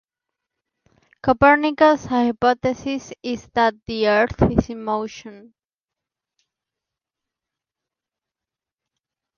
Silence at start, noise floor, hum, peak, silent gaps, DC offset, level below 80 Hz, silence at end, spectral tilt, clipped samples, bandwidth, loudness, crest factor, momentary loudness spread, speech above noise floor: 1.25 s; -89 dBFS; none; -2 dBFS; none; under 0.1%; -42 dBFS; 4 s; -6 dB/octave; under 0.1%; 7 kHz; -19 LUFS; 20 dB; 13 LU; 70 dB